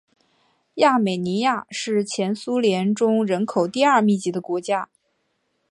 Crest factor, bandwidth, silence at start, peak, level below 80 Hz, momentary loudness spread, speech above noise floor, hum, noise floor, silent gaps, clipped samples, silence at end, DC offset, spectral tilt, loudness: 18 dB; 11.5 kHz; 0.75 s; -4 dBFS; -72 dBFS; 8 LU; 51 dB; none; -71 dBFS; none; under 0.1%; 0.85 s; under 0.1%; -5 dB/octave; -21 LUFS